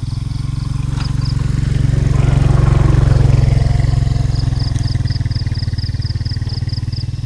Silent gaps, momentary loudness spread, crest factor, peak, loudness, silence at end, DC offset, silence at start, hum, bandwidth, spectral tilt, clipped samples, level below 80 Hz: none; 8 LU; 12 dB; -2 dBFS; -16 LUFS; 0 s; under 0.1%; 0 s; none; 10.5 kHz; -7 dB/octave; under 0.1%; -20 dBFS